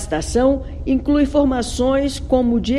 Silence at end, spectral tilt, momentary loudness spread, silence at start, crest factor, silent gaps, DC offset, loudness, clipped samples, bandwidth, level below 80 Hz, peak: 0 s; -5.5 dB/octave; 4 LU; 0 s; 14 dB; none; under 0.1%; -18 LUFS; under 0.1%; 12.5 kHz; -30 dBFS; -4 dBFS